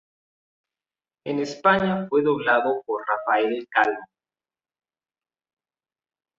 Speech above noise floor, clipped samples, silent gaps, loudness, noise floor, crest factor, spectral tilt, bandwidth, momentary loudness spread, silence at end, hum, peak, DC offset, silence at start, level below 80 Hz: over 68 dB; under 0.1%; none; -22 LUFS; under -90 dBFS; 22 dB; -6 dB/octave; 7.6 kHz; 8 LU; 2.35 s; none; -4 dBFS; under 0.1%; 1.25 s; -64 dBFS